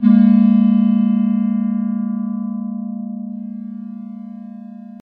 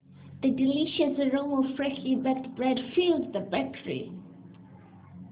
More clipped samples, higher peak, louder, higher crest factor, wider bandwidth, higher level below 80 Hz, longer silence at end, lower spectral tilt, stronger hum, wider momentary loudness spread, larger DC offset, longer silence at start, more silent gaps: neither; first, -2 dBFS vs -14 dBFS; first, -16 LUFS vs -28 LUFS; about the same, 14 dB vs 16 dB; about the same, 3.7 kHz vs 4 kHz; second, -78 dBFS vs -64 dBFS; about the same, 0.05 s vs 0 s; first, -11.5 dB/octave vs -4 dB/octave; neither; first, 21 LU vs 11 LU; neither; about the same, 0 s vs 0.1 s; neither